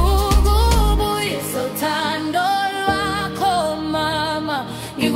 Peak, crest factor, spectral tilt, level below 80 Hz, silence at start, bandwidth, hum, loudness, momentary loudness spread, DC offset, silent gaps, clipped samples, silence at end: -4 dBFS; 16 dB; -4.5 dB/octave; -22 dBFS; 0 s; 16.5 kHz; none; -19 LUFS; 7 LU; under 0.1%; none; under 0.1%; 0 s